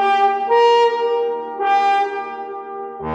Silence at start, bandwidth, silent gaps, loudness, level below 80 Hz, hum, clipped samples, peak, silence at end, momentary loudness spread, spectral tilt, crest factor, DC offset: 0 s; 8.4 kHz; none; -17 LUFS; -58 dBFS; none; under 0.1%; -4 dBFS; 0 s; 16 LU; -4 dB/octave; 12 dB; under 0.1%